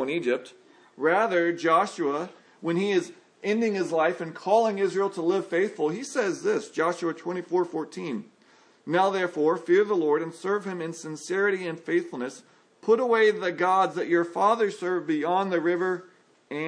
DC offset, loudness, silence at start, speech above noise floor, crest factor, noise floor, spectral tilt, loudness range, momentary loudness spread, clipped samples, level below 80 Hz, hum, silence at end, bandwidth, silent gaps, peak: under 0.1%; -26 LUFS; 0 s; 33 dB; 16 dB; -59 dBFS; -5.5 dB/octave; 4 LU; 12 LU; under 0.1%; -86 dBFS; none; 0 s; 10.5 kHz; none; -8 dBFS